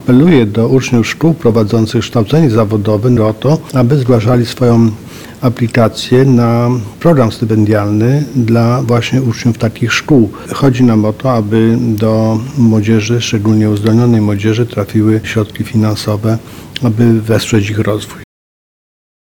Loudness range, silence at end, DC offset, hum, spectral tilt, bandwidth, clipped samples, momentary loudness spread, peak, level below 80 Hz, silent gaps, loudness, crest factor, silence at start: 2 LU; 1 s; 0.8%; none; -7 dB/octave; 18.5 kHz; under 0.1%; 6 LU; 0 dBFS; -40 dBFS; none; -11 LUFS; 10 dB; 0 s